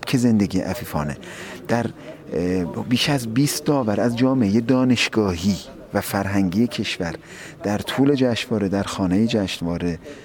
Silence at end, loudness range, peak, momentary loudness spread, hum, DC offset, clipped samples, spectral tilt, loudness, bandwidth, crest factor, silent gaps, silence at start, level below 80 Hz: 0 s; 3 LU; -6 dBFS; 11 LU; none; under 0.1%; under 0.1%; -5.5 dB/octave; -21 LUFS; 19 kHz; 14 dB; none; 0 s; -48 dBFS